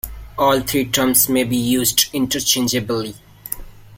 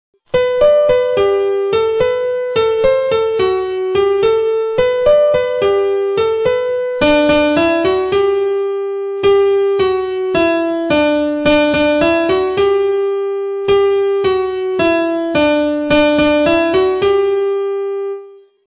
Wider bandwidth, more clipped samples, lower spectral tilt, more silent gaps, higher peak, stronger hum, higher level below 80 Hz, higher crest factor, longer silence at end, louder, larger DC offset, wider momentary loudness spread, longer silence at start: first, 17 kHz vs 4 kHz; neither; second, -3 dB/octave vs -9.5 dB/octave; neither; about the same, 0 dBFS vs -2 dBFS; neither; about the same, -42 dBFS vs -42 dBFS; first, 20 dB vs 12 dB; second, 0 s vs 0.45 s; second, -17 LUFS vs -14 LUFS; neither; first, 16 LU vs 6 LU; second, 0.05 s vs 0.35 s